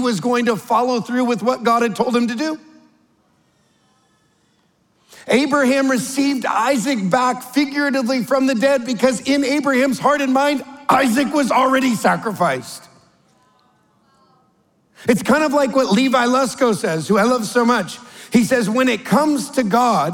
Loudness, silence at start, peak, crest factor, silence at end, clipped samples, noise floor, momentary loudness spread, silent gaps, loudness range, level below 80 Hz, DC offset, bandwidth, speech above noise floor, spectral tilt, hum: -17 LUFS; 0 s; -2 dBFS; 16 dB; 0 s; under 0.1%; -61 dBFS; 5 LU; none; 7 LU; -62 dBFS; under 0.1%; 17.5 kHz; 44 dB; -4.5 dB/octave; none